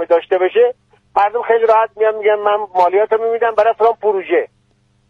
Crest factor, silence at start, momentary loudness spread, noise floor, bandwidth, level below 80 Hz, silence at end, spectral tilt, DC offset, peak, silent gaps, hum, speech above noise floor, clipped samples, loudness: 14 dB; 0 s; 5 LU; -58 dBFS; 5.6 kHz; -62 dBFS; 0.65 s; -5.5 dB/octave; under 0.1%; -2 dBFS; none; none; 44 dB; under 0.1%; -15 LUFS